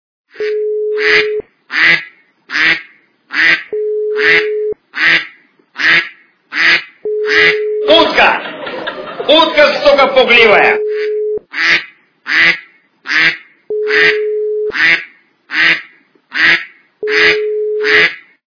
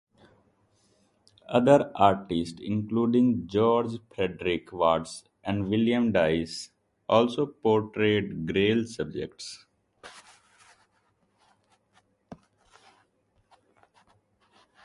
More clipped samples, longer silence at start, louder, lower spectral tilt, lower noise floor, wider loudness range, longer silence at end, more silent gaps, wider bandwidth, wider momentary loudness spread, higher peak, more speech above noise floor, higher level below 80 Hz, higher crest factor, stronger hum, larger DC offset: first, 0.5% vs under 0.1%; second, 0.35 s vs 1.5 s; first, -11 LUFS vs -26 LUFS; second, -3 dB/octave vs -6.5 dB/octave; second, -43 dBFS vs -70 dBFS; second, 4 LU vs 8 LU; second, 0.3 s vs 2.5 s; neither; second, 5.4 kHz vs 11.5 kHz; about the same, 13 LU vs 15 LU; first, 0 dBFS vs -4 dBFS; second, 34 dB vs 45 dB; first, -50 dBFS vs -56 dBFS; second, 12 dB vs 24 dB; neither; neither